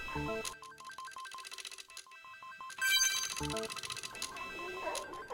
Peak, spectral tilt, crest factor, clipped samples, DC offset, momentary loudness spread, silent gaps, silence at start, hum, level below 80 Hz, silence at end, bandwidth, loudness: -18 dBFS; -1 dB/octave; 22 dB; under 0.1%; under 0.1%; 20 LU; none; 0 s; none; -60 dBFS; 0 s; 17 kHz; -36 LUFS